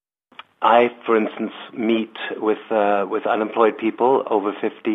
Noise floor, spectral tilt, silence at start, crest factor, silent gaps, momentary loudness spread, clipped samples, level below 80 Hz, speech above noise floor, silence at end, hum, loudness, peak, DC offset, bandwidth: -46 dBFS; -7.5 dB/octave; 0.6 s; 18 dB; none; 9 LU; under 0.1%; -74 dBFS; 27 dB; 0 s; none; -20 LUFS; -2 dBFS; under 0.1%; 4 kHz